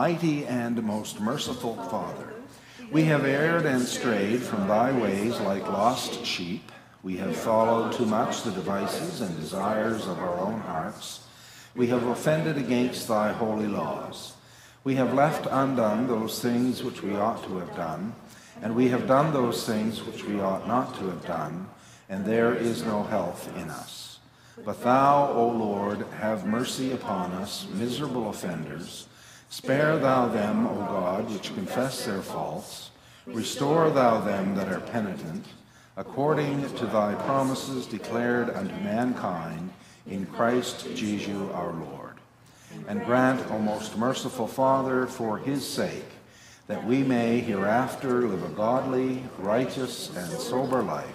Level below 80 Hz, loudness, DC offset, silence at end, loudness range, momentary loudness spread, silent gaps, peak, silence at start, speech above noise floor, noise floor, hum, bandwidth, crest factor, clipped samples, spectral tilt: -64 dBFS; -27 LUFS; under 0.1%; 0 s; 4 LU; 15 LU; none; -8 dBFS; 0 s; 27 dB; -54 dBFS; none; 15.5 kHz; 20 dB; under 0.1%; -5.5 dB/octave